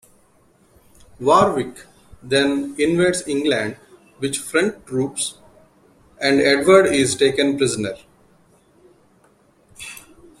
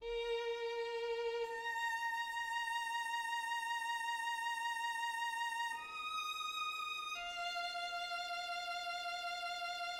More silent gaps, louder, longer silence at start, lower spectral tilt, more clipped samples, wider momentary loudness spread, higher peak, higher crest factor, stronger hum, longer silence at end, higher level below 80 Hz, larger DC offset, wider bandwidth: neither; first, -18 LUFS vs -40 LUFS; first, 1.2 s vs 0 s; first, -4 dB/octave vs 1 dB/octave; neither; first, 17 LU vs 3 LU; first, -2 dBFS vs -30 dBFS; first, 20 dB vs 12 dB; neither; first, 0.4 s vs 0 s; first, -54 dBFS vs -72 dBFS; neither; second, 14.5 kHz vs 16.5 kHz